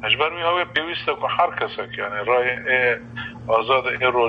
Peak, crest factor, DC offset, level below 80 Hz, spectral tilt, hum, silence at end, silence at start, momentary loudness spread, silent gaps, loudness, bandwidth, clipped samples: -4 dBFS; 18 dB; under 0.1%; -54 dBFS; -6 dB/octave; none; 0 s; 0 s; 8 LU; none; -21 LUFS; 6.2 kHz; under 0.1%